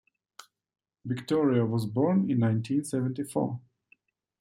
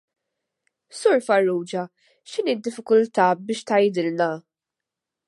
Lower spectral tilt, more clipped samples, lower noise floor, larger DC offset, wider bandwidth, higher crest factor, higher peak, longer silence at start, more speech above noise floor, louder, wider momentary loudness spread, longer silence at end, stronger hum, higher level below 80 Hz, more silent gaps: first, -7.5 dB/octave vs -5 dB/octave; neither; second, -66 dBFS vs -87 dBFS; neither; first, 15 kHz vs 11.5 kHz; about the same, 16 dB vs 20 dB; second, -12 dBFS vs -4 dBFS; about the same, 1.05 s vs 0.95 s; second, 39 dB vs 65 dB; second, -28 LUFS vs -22 LUFS; about the same, 11 LU vs 12 LU; about the same, 0.8 s vs 0.9 s; neither; first, -72 dBFS vs -80 dBFS; neither